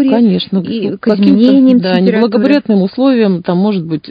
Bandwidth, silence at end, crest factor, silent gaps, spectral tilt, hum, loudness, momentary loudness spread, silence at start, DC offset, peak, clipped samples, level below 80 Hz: 5.2 kHz; 0 s; 10 dB; none; -9.5 dB/octave; none; -11 LUFS; 8 LU; 0 s; under 0.1%; 0 dBFS; 0.3%; -54 dBFS